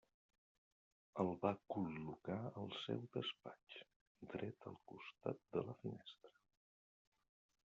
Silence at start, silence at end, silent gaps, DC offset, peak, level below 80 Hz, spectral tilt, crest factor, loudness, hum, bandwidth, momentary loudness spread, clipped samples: 1.15 s; 1.4 s; 3.96-4.15 s; under 0.1%; -24 dBFS; -82 dBFS; -5 dB/octave; 24 dB; -47 LUFS; none; 7.4 kHz; 15 LU; under 0.1%